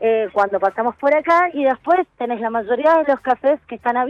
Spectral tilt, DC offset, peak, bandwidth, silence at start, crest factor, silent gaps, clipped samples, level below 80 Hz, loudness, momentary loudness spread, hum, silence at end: -6 dB/octave; under 0.1%; -4 dBFS; 8 kHz; 0 s; 14 dB; none; under 0.1%; -60 dBFS; -18 LUFS; 7 LU; none; 0 s